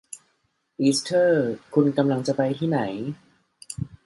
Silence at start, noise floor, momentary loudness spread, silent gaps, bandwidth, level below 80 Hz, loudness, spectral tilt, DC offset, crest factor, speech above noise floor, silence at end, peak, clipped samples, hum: 0.1 s; -71 dBFS; 17 LU; none; 11.5 kHz; -60 dBFS; -23 LUFS; -5.5 dB/octave; under 0.1%; 18 dB; 49 dB; 0.2 s; -6 dBFS; under 0.1%; none